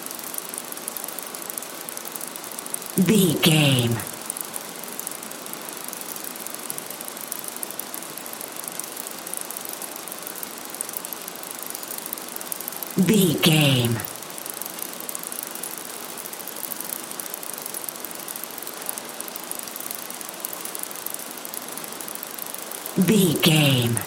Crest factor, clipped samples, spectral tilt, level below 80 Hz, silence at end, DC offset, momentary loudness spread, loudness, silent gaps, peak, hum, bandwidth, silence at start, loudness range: 24 dB; under 0.1%; -4 dB/octave; -66 dBFS; 0 s; under 0.1%; 14 LU; -26 LUFS; none; -2 dBFS; none; 17 kHz; 0 s; 9 LU